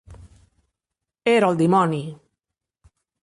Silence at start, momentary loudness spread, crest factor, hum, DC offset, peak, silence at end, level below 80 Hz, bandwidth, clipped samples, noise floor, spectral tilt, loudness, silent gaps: 0.1 s; 12 LU; 18 dB; none; under 0.1%; -6 dBFS; 1.1 s; -56 dBFS; 11.5 kHz; under 0.1%; -85 dBFS; -6.5 dB/octave; -20 LUFS; none